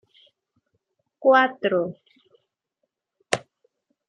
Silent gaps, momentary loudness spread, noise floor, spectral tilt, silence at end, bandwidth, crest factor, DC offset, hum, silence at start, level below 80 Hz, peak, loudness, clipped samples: none; 11 LU; -79 dBFS; -4 dB/octave; 0.7 s; 10.5 kHz; 26 dB; under 0.1%; none; 1.2 s; -74 dBFS; 0 dBFS; -22 LUFS; under 0.1%